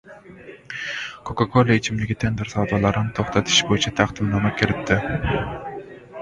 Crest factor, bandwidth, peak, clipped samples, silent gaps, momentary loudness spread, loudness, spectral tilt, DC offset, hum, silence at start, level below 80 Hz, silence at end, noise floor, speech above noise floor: 22 dB; 9.4 kHz; 0 dBFS; under 0.1%; none; 15 LU; -21 LUFS; -4.5 dB/octave; under 0.1%; none; 0.05 s; -40 dBFS; 0 s; -43 dBFS; 22 dB